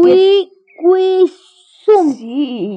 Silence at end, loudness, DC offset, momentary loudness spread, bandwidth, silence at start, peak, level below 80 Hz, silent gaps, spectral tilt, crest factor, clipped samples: 0 s; -13 LUFS; under 0.1%; 10 LU; 8.2 kHz; 0 s; 0 dBFS; -74 dBFS; none; -6 dB/octave; 12 dB; under 0.1%